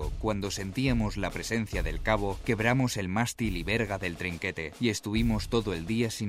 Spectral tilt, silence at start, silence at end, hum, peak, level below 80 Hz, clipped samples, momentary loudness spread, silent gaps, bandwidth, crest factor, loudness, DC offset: -5 dB/octave; 0 s; 0 s; none; -10 dBFS; -40 dBFS; under 0.1%; 5 LU; none; 16 kHz; 18 dB; -30 LUFS; under 0.1%